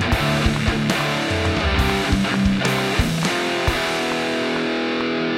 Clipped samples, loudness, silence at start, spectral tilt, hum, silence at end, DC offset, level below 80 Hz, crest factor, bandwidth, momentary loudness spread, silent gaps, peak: under 0.1%; -20 LUFS; 0 s; -5 dB/octave; none; 0 s; under 0.1%; -30 dBFS; 16 dB; 16 kHz; 3 LU; none; -4 dBFS